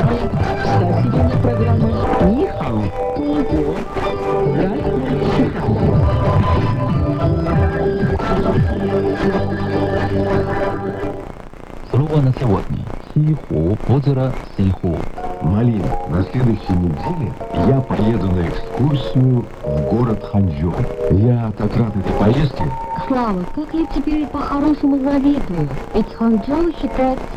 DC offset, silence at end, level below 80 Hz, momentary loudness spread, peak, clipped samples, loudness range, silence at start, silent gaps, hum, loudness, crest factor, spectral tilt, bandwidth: under 0.1%; 0 s; -28 dBFS; 7 LU; -4 dBFS; under 0.1%; 2 LU; 0 s; none; none; -18 LUFS; 14 dB; -9 dB/octave; 9.4 kHz